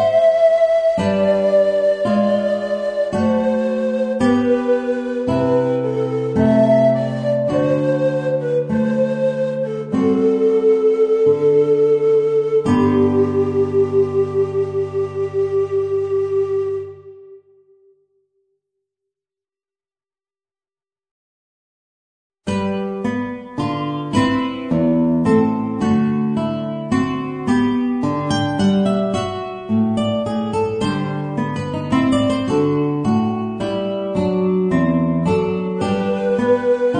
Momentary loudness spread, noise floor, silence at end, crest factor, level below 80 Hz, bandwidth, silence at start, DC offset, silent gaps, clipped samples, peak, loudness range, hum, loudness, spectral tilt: 8 LU; under -90 dBFS; 0 s; 14 dB; -50 dBFS; 10 kHz; 0 s; under 0.1%; 21.11-22.30 s; under 0.1%; -4 dBFS; 7 LU; none; -18 LUFS; -7.5 dB/octave